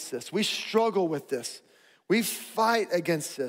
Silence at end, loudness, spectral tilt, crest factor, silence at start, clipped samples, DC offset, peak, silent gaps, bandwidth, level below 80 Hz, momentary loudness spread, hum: 0 s; -27 LUFS; -3.5 dB/octave; 18 dB; 0 s; under 0.1%; under 0.1%; -10 dBFS; none; 16 kHz; -78 dBFS; 9 LU; none